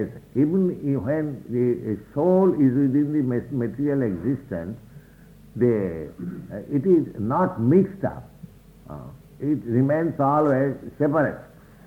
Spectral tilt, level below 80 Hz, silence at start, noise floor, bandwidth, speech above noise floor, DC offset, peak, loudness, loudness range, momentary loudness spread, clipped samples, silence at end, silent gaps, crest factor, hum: -10.5 dB/octave; -54 dBFS; 0 s; -48 dBFS; 15.5 kHz; 26 dB; under 0.1%; -6 dBFS; -23 LUFS; 4 LU; 16 LU; under 0.1%; 0.4 s; none; 16 dB; none